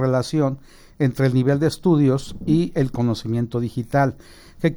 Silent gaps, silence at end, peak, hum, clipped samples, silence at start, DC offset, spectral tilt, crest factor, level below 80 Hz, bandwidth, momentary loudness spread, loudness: none; 0 s; -6 dBFS; none; under 0.1%; 0 s; under 0.1%; -7.5 dB/octave; 14 dB; -46 dBFS; over 20 kHz; 7 LU; -21 LUFS